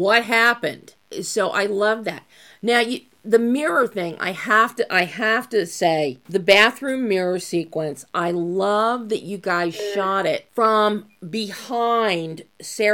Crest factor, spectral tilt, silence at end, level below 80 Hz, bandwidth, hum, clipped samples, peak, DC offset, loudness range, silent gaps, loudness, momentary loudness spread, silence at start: 20 dB; -4 dB/octave; 0 s; -70 dBFS; 17.5 kHz; none; under 0.1%; -2 dBFS; under 0.1%; 3 LU; none; -20 LUFS; 12 LU; 0 s